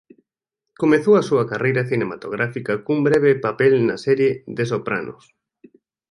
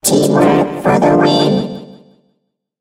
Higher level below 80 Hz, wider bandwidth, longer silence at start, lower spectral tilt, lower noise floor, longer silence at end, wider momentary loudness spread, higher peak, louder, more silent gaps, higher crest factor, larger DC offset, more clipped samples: second, -60 dBFS vs -48 dBFS; second, 11 kHz vs 16 kHz; first, 0.8 s vs 0.05 s; first, -7.5 dB/octave vs -5 dB/octave; first, -83 dBFS vs -67 dBFS; first, 1 s vs 0.85 s; about the same, 9 LU vs 10 LU; about the same, -2 dBFS vs 0 dBFS; second, -19 LUFS vs -12 LUFS; neither; about the same, 18 dB vs 14 dB; neither; neither